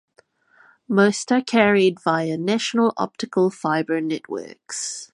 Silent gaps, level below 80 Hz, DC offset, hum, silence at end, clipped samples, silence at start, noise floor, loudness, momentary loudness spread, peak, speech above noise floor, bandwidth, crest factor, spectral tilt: none; -66 dBFS; under 0.1%; none; 0.1 s; under 0.1%; 0.9 s; -59 dBFS; -21 LUFS; 11 LU; -2 dBFS; 38 dB; 11.5 kHz; 20 dB; -4.5 dB/octave